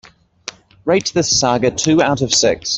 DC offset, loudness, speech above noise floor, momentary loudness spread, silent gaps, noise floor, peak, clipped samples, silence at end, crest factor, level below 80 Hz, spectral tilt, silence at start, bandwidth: under 0.1%; -15 LUFS; 21 dB; 19 LU; none; -36 dBFS; -2 dBFS; under 0.1%; 0 s; 16 dB; -46 dBFS; -3 dB/octave; 0.45 s; 8.4 kHz